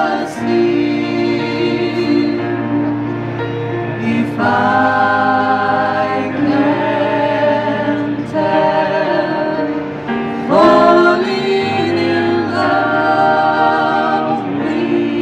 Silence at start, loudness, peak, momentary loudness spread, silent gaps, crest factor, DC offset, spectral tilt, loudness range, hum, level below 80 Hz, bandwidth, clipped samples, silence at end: 0 s; -15 LUFS; 0 dBFS; 7 LU; none; 14 dB; under 0.1%; -7 dB/octave; 4 LU; none; -52 dBFS; 9.6 kHz; under 0.1%; 0 s